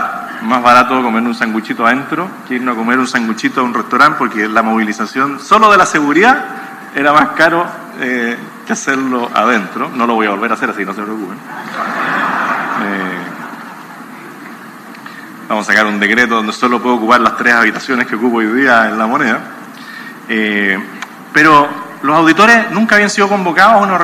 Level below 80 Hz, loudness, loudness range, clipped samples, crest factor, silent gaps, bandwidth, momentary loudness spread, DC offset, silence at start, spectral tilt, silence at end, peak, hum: -54 dBFS; -12 LUFS; 8 LU; 0.4%; 12 dB; none; 17.5 kHz; 20 LU; under 0.1%; 0 s; -4 dB/octave; 0 s; 0 dBFS; none